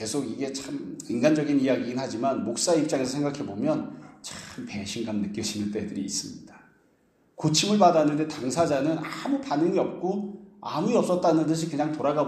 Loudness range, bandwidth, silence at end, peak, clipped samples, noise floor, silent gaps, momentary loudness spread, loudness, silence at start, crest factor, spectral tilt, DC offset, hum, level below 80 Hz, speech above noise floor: 7 LU; 14.5 kHz; 0 s; -6 dBFS; under 0.1%; -65 dBFS; none; 13 LU; -26 LUFS; 0 s; 20 dB; -5 dB/octave; under 0.1%; none; -66 dBFS; 39 dB